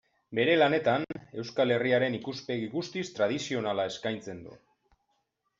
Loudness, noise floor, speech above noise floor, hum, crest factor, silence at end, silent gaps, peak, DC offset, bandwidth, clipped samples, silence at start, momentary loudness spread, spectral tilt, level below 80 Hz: -29 LUFS; -77 dBFS; 48 dB; none; 18 dB; 1.05 s; none; -12 dBFS; under 0.1%; 7.8 kHz; under 0.1%; 0.3 s; 14 LU; -5 dB/octave; -70 dBFS